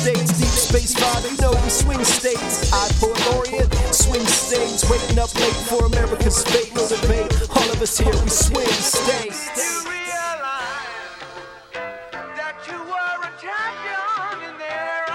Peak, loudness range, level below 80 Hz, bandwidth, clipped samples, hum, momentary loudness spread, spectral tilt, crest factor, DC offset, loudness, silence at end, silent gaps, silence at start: -2 dBFS; 10 LU; -24 dBFS; 17 kHz; under 0.1%; none; 13 LU; -3 dB/octave; 18 dB; under 0.1%; -19 LUFS; 0 s; none; 0 s